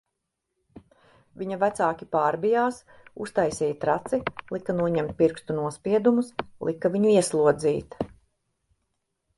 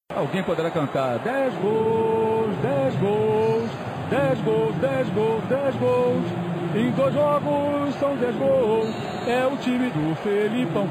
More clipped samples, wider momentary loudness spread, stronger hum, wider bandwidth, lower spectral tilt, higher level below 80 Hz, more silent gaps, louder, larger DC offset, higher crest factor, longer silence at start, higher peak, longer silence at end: neither; first, 12 LU vs 4 LU; neither; second, 11.5 kHz vs 15.5 kHz; second, -6 dB/octave vs -7.5 dB/octave; about the same, -58 dBFS vs -54 dBFS; neither; about the same, -25 LUFS vs -23 LUFS; neither; first, 20 dB vs 10 dB; first, 0.75 s vs 0.1 s; first, -6 dBFS vs -12 dBFS; first, 1.3 s vs 0 s